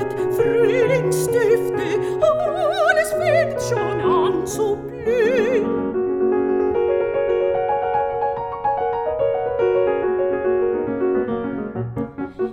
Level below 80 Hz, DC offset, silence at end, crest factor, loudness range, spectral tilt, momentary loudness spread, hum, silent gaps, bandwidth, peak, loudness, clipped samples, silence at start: -48 dBFS; under 0.1%; 0 s; 16 dB; 2 LU; -5.5 dB/octave; 7 LU; none; none; 17 kHz; -4 dBFS; -20 LUFS; under 0.1%; 0 s